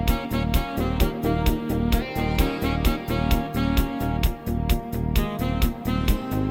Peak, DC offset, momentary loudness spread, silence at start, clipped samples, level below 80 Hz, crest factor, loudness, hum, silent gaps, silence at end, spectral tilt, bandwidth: -6 dBFS; under 0.1%; 2 LU; 0 s; under 0.1%; -26 dBFS; 18 dB; -25 LUFS; none; none; 0 s; -6 dB/octave; 17 kHz